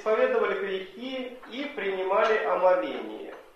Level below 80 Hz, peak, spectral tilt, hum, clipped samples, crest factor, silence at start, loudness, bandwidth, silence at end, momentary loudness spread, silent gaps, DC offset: -70 dBFS; -10 dBFS; -5 dB/octave; none; under 0.1%; 18 dB; 0 s; -27 LUFS; 7.4 kHz; 0.15 s; 13 LU; none; under 0.1%